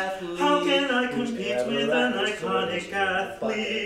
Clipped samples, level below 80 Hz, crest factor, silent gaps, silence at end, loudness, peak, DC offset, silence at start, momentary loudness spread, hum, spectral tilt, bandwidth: under 0.1%; -60 dBFS; 16 dB; none; 0 s; -25 LUFS; -10 dBFS; under 0.1%; 0 s; 6 LU; none; -4 dB/octave; 15.5 kHz